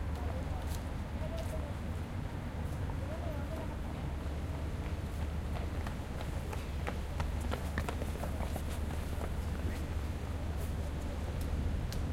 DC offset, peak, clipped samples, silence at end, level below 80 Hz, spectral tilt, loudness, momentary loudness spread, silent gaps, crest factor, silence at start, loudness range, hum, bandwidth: under 0.1%; -18 dBFS; under 0.1%; 0 s; -40 dBFS; -6.5 dB/octave; -39 LUFS; 3 LU; none; 18 dB; 0 s; 1 LU; none; 16 kHz